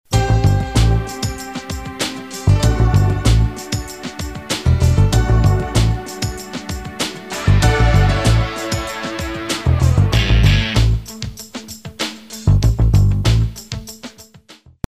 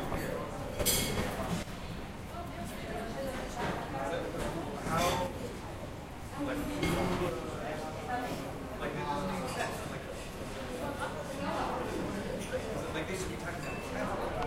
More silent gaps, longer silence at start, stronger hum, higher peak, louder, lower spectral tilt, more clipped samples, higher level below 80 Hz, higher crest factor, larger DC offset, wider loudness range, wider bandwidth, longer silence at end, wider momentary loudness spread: neither; about the same, 0.1 s vs 0 s; neither; first, -2 dBFS vs -16 dBFS; first, -17 LUFS vs -36 LUFS; about the same, -5.5 dB/octave vs -4.5 dB/octave; neither; first, -22 dBFS vs -48 dBFS; second, 14 dB vs 20 dB; first, 0.2% vs under 0.1%; about the same, 2 LU vs 3 LU; about the same, 15.5 kHz vs 16 kHz; first, 0.35 s vs 0 s; first, 14 LU vs 10 LU